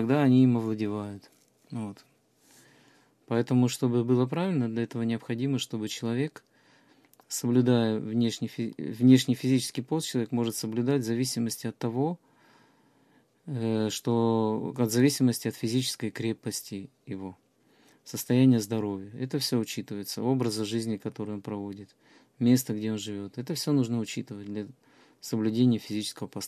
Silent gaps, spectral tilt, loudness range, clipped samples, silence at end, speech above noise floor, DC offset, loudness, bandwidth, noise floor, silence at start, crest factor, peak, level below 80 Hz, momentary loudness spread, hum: none; -6 dB/octave; 5 LU; under 0.1%; 0 s; 37 dB; under 0.1%; -28 LUFS; 14.5 kHz; -64 dBFS; 0 s; 20 dB; -8 dBFS; -70 dBFS; 15 LU; none